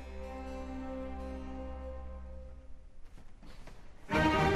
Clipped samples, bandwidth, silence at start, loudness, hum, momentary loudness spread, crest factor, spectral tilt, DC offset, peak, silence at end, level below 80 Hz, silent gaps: under 0.1%; 13.5 kHz; 0 s; -37 LUFS; none; 27 LU; 22 dB; -6 dB/octave; under 0.1%; -16 dBFS; 0 s; -46 dBFS; none